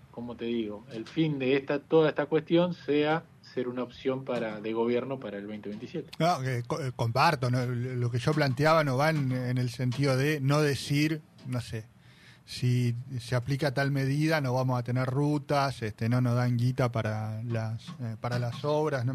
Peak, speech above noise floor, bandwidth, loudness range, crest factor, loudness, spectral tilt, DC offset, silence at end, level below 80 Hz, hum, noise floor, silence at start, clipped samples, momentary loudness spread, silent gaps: -12 dBFS; 27 dB; 14.5 kHz; 4 LU; 18 dB; -29 LUFS; -6.5 dB/octave; under 0.1%; 0 s; -62 dBFS; none; -55 dBFS; 0.15 s; under 0.1%; 12 LU; none